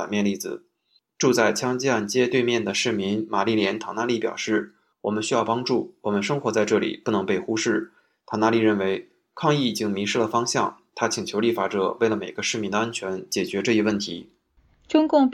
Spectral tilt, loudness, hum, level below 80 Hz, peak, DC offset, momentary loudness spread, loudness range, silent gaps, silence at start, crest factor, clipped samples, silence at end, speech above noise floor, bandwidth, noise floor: -4.5 dB/octave; -24 LUFS; none; -66 dBFS; -4 dBFS; under 0.1%; 7 LU; 2 LU; none; 0 s; 20 dB; under 0.1%; 0 s; 44 dB; 16.5 kHz; -67 dBFS